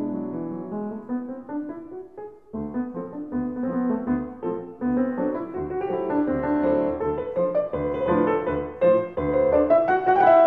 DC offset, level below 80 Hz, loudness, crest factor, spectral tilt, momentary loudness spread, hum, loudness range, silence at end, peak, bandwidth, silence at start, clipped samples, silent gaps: 0.2%; -50 dBFS; -24 LUFS; 18 dB; -10 dB/octave; 13 LU; none; 9 LU; 0 s; -6 dBFS; 4.5 kHz; 0 s; under 0.1%; none